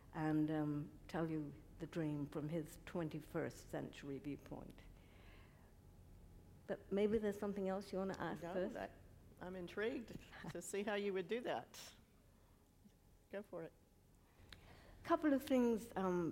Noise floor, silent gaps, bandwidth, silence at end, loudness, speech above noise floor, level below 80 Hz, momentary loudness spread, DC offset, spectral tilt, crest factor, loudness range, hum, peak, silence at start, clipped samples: -70 dBFS; none; 16 kHz; 0 s; -44 LUFS; 27 dB; -68 dBFS; 23 LU; under 0.1%; -6.5 dB/octave; 20 dB; 9 LU; none; -24 dBFS; 0 s; under 0.1%